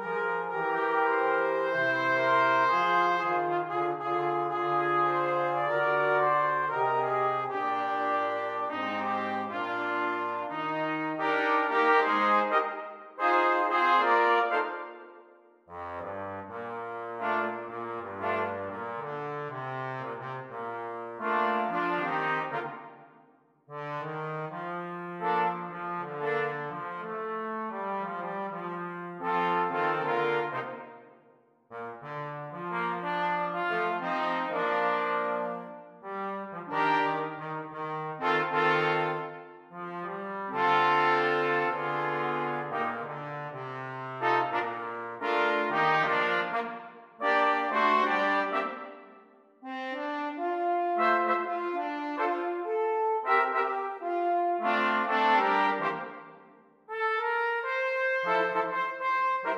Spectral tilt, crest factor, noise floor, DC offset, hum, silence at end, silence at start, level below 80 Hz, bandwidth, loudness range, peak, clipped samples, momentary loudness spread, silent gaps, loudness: -6 dB/octave; 18 dB; -62 dBFS; under 0.1%; none; 0 s; 0 s; -82 dBFS; 11.5 kHz; 8 LU; -12 dBFS; under 0.1%; 13 LU; none; -29 LUFS